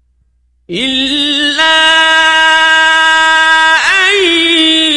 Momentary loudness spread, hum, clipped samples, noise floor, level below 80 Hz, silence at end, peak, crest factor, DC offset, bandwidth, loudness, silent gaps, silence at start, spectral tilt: 5 LU; none; 0.2%; -54 dBFS; -46 dBFS; 0 s; 0 dBFS; 10 dB; under 0.1%; 11.5 kHz; -7 LUFS; none; 0.7 s; -0.5 dB/octave